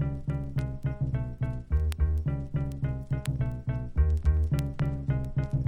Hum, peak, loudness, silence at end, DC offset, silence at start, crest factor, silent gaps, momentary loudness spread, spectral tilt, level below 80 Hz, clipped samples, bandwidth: none; -12 dBFS; -30 LUFS; 0 s; under 0.1%; 0 s; 16 dB; none; 7 LU; -8.5 dB/octave; -34 dBFS; under 0.1%; 11.5 kHz